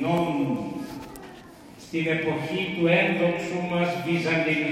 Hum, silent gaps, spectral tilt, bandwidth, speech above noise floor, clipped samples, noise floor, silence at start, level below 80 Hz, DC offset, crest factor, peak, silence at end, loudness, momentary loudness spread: none; none; -6.5 dB/octave; 15.5 kHz; 21 dB; under 0.1%; -46 dBFS; 0 s; -60 dBFS; under 0.1%; 16 dB; -8 dBFS; 0 s; -25 LUFS; 20 LU